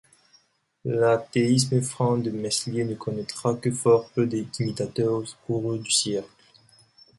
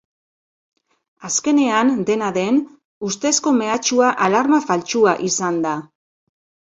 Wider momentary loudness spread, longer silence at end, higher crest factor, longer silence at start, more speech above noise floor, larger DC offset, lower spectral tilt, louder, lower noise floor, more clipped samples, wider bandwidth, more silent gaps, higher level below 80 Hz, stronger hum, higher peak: about the same, 9 LU vs 9 LU; about the same, 0.95 s vs 0.9 s; about the same, 20 dB vs 18 dB; second, 0.85 s vs 1.2 s; second, 38 dB vs over 73 dB; neither; first, -5 dB/octave vs -3.5 dB/octave; second, -25 LUFS vs -18 LUFS; second, -63 dBFS vs under -90 dBFS; neither; first, 11.5 kHz vs 8 kHz; second, none vs 2.85-3.01 s; about the same, -62 dBFS vs -64 dBFS; neither; second, -6 dBFS vs 0 dBFS